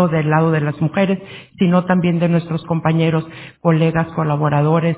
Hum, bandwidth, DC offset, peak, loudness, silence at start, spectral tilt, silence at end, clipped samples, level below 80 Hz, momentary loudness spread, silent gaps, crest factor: none; 4 kHz; under 0.1%; -2 dBFS; -17 LUFS; 0 s; -12 dB/octave; 0 s; under 0.1%; -50 dBFS; 6 LU; none; 14 dB